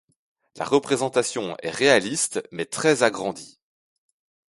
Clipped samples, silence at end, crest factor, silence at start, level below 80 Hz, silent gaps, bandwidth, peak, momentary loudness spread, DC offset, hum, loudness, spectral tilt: under 0.1%; 1.05 s; 22 dB; 0.55 s; -66 dBFS; none; 11.5 kHz; -4 dBFS; 12 LU; under 0.1%; none; -22 LUFS; -3 dB/octave